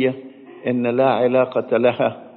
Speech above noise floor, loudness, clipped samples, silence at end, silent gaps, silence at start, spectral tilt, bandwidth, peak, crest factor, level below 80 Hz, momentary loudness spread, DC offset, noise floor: 20 dB; -19 LUFS; under 0.1%; 0.05 s; none; 0 s; -5 dB/octave; 4.3 kHz; -4 dBFS; 14 dB; -68 dBFS; 8 LU; under 0.1%; -38 dBFS